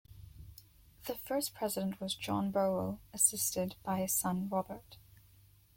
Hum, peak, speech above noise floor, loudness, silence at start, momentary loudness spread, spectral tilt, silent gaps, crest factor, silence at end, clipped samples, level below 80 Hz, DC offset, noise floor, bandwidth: none; -12 dBFS; 28 dB; -34 LUFS; 0.1 s; 19 LU; -3.5 dB/octave; none; 24 dB; 0.55 s; under 0.1%; -62 dBFS; under 0.1%; -63 dBFS; 16.5 kHz